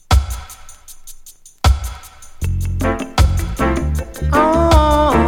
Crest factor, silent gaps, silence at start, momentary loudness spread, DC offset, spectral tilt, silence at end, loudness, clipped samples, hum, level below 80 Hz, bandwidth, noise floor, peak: 16 dB; none; 0.1 s; 24 LU; under 0.1%; -6 dB/octave; 0 s; -17 LUFS; under 0.1%; none; -20 dBFS; 16.5 kHz; -40 dBFS; 0 dBFS